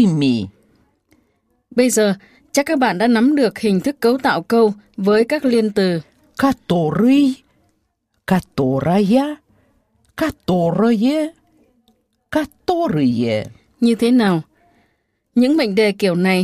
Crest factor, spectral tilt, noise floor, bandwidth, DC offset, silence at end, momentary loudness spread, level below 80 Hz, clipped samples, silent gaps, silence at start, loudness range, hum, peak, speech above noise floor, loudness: 16 dB; -6 dB/octave; -68 dBFS; 15.5 kHz; under 0.1%; 0 s; 9 LU; -52 dBFS; under 0.1%; none; 0 s; 4 LU; none; -2 dBFS; 52 dB; -17 LUFS